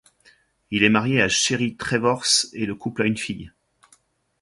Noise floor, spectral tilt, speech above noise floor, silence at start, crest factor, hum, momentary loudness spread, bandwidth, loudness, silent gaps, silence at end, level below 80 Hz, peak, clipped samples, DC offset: -61 dBFS; -3 dB/octave; 39 dB; 0.7 s; 22 dB; none; 10 LU; 11.5 kHz; -21 LUFS; none; 0.95 s; -54 dBFS; -2 dBFS; under 0.1%; under 0.1%